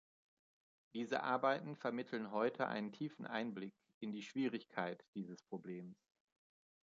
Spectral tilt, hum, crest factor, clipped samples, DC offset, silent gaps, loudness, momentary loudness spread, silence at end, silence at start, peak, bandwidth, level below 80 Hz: -4 dB/octave; none; 22 dB; under 0.1%; under 0.1%; 3.94-4.01 s, 5.08-5.13 s; -43 LUFS; 13 LU; 0.9 s; 0.95 s; -22 dBFS; 7.6 kHz; under -90 dBFS